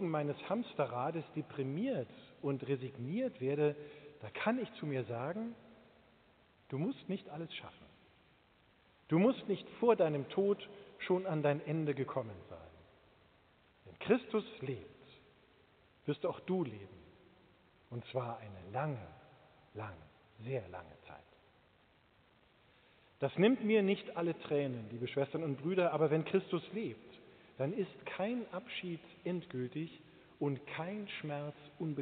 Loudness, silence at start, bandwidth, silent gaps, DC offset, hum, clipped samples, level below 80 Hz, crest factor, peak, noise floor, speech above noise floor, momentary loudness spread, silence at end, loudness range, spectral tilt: -38 LUFS; 0 s; 4.6 kHz; none; under 0.1%; none; under 0.1%; -76 dBFS; 22 dB; -16 dBFS; -69 dBFS; 32 dB; 19 LU; 0 s; 11 LU; -6 dB/octave